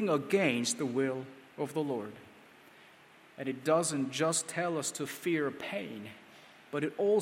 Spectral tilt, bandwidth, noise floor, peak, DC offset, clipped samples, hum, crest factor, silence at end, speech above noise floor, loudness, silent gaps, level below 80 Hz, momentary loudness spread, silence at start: -4 dB/octave; 16 kHz; -58 dBFS; -14 dBFS; under 0.1%; under 0.1%; none; 20 dB; 0 s; 26 dB; -33 LUFS; none; -80 dBFS; 17 LU; 0 s